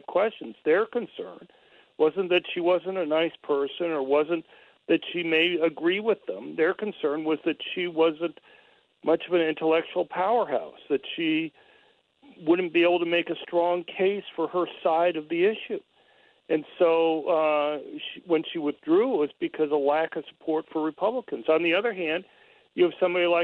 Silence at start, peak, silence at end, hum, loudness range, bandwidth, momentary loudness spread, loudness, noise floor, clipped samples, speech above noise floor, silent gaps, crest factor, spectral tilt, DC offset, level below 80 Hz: 0.1 s; -10 dBFS; 0 s; none; 2 LU; 4.3 kHz; 9 LU; -26 LUFS; -62 dBFS; under 0.1%; 36 dB; none; 16 dB; -7.5 dB/octave; under 0.1%; -76 dBFS